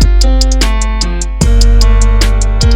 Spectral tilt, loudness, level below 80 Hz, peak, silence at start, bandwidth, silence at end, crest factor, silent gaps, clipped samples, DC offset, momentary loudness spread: -4.5 dB/octave; -11 LUFS; -8 dBFS; 0 dBFS; 0 s; 11.5 kHz; 0 s; 8 dB; none; 0.4%; under 0.1%; 5 LU